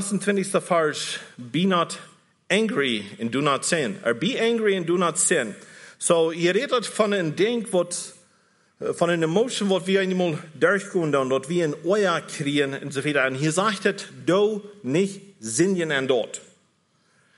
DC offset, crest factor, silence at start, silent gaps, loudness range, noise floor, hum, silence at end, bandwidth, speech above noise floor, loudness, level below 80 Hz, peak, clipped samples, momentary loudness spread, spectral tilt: under 0.1%; 18 dB; 0 s; none; 2 LU; -65 dBFS; none; 0.95 s; 11.5 kHz; 42 dB; -23 LUFS; -74 dBFS; -6 dBFS; under 0.1%; 8 LU; -4 dB/octave